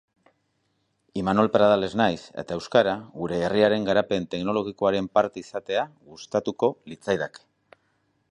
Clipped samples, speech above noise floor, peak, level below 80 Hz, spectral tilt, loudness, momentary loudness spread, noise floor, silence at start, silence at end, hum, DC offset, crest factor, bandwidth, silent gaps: under 0.1%; 48 dB; -6 dBFS; -58 dBFS; -6 dB/octave; -24 LUFS; 13 LU; -72 dBFS; 1.15 s; 0.95 s; none; under 0.1%; 20 dB; 10.5 kHz; none